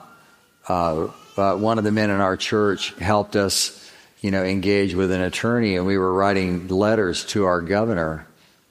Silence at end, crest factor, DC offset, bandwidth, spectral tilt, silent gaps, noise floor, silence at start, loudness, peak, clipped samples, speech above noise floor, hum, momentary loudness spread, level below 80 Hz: 0.45 s; 20 dB; under 0.1%; 15.5 kHz; -5 dB/octave; none; -54 dBFS; 0.65 s; -21 LUFS; -2 dBFS; under 0.1%; 33 dB; none; 6 LU; -50 dBFS